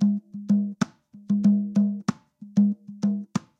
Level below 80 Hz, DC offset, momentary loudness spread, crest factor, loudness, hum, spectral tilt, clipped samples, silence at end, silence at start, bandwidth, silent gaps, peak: -70 dBFS; under 0.1%; 9 LU; 16 dB; -25 LUFS; none; -7.5 dB/octave; under 0.1%; 0.2 s; 0 s; 7.8 kHz; none; -8 dBFS